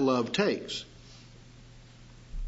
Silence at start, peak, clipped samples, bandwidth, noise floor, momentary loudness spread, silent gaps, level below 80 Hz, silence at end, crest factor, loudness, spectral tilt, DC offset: 0 s; -12 dBFS; under 0.1%; 8 kHz; -52 dBFS; 26 LU; none; -46 dBFS; 0 s; 20 dB; -30 LUFS; -5 dB/octave; under 0.1%